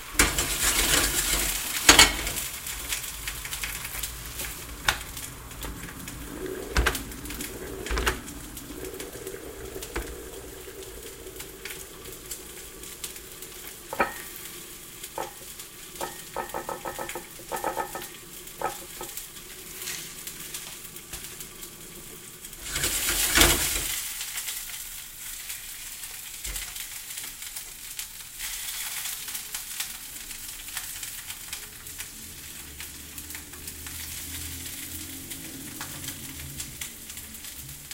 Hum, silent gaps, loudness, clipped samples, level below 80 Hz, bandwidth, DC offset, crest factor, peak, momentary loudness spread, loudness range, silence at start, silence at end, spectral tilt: none; none; -29 LUFS; under 0.1%; -42 dBFS; 17 kHz; under 0.1%; 32 dB; 0 dBFS; 16 LU; 14 LU; 0 s; 0 s; -1 dB/octave